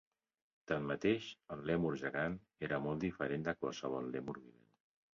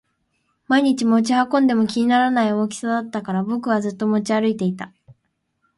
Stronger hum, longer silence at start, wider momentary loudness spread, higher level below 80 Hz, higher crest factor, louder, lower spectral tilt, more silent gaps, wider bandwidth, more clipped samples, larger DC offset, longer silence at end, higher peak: neither; about the same, 0.7 s vs 0.7 s; about the same, 9 LU vs 7 LU; about the same, -66 dBFS vs -66 dBFS; about the same, 20 dB vs 16 dB; second, -40 LUFS vs -19 LUFS; about the same, -5 dB/octave vs -5.5 dB/octave; neither; second, 7.4 kHz vs 11.5 kHz; neither; neither; about the same, 0.65 s vs 0.65 s; second, -20 dBFS vs -4 dBFS